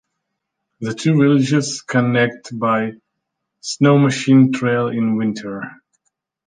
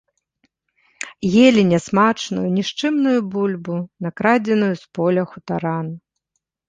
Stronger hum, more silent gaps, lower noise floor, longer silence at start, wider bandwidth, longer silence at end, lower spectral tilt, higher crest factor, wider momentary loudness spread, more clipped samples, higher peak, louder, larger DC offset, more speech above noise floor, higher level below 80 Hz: neither; neither; about the same, -77 dBFS vs -76 dBFS; second, 0.8 s vs 1 s; about the same, 9.6 kHz vs 9.4 kHz; about the same, 0.75 s vs 0.7 s; about the same, -6 dB/octave vs -6 dB/octave; about the same, 16 dB vs 18 dB; about the same, 15 LU vs 14 LU; neither; about the same, -2 dBFS vs -2 dBFS; about the same, -17 LUFS vs -19 LUFS; neither; about the same, 61 dB vs 58 dB; about the same, -62 dBFS vs -58 dBFS